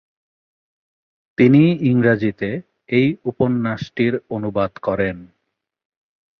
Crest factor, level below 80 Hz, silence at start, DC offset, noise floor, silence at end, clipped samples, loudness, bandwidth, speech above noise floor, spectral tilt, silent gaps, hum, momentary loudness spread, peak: 18 dB; -52 dBFS; 1.4 s; under 0.1%; -76 dBFS; 1.15 s; under 0.1%; -18 LUFS; 6.4 kHz; 59 dB; -9 dB/octave; none; none; 12 LU; -2 dBFS